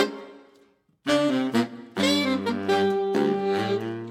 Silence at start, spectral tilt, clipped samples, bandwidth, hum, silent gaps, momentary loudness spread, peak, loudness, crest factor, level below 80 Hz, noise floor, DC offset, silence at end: 0 s; -5 dB/octave; under 0.1%; 16.5 kHz; none; none; 6 LU; -8 dBFS; -24 LUFS; 18 dB; -70 dBFS; -61 dBFS; under 0.1%; 0 s